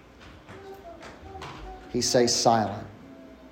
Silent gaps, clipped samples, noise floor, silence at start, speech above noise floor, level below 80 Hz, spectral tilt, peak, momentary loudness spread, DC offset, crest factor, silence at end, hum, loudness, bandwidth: none; under 0.1%; -49 dBFS; 0.2 s; 25 dB; -54 dBFS; -3.5 dB/octave; -8 dBFS; 25 LU; under 0.1%; 20 dB; 0.05 s; none; -24 LUFS; 16 kHz